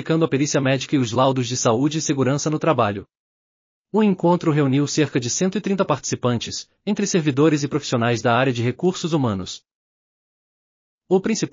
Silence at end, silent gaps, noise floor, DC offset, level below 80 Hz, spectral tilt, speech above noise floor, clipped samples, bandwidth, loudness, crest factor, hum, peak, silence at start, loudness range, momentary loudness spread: 0.05 s; 3.19-3.85 s, 9.75-10.98 s; under -90 dBFS; under 0.1%; -64 dBFS; -5.5 dB/octave; over 70 dB; under 0.1%; 7.4 kHz; -20 LUFS; 16 dB; none; -4 dBFS; 0 s; 2 LU; 6 LU